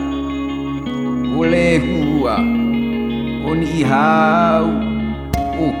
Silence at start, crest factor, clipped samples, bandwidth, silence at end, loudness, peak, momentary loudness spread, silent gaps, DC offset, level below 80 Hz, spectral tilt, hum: 0 s; 14 dB; under 0.1%; 14 kHz; 0 s; -17 LUFS; -2 dBFS; 9 LU; none; under 0.1%; -34 dBFS; -7 dB/octave; none